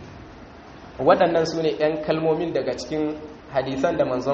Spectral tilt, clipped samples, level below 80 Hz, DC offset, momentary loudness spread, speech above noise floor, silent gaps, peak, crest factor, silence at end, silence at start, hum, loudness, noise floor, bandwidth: -4.5 dB/octave; under 0.1%; -52 dBFS; under 0.1%; 24 LU; 21 dB; none; -4 dBFS; 20 dB; 0 s; 0 s; none; -23 LUFS; -43 dBFS; 7.4 kHz